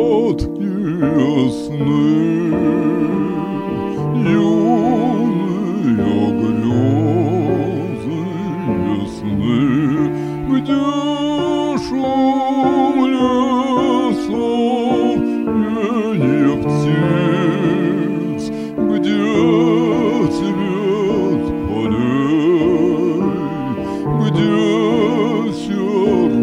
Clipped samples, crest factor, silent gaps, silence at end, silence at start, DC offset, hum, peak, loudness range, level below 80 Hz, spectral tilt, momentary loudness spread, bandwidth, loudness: under 0.1%; 14 dB; none; 0 s; 0 s; under 0.1%; none; -2 dBFS; 2 LU; -42 dBFS; -7.5 dB/octave; 6 LU; 10.5 kHz; -16 LUFS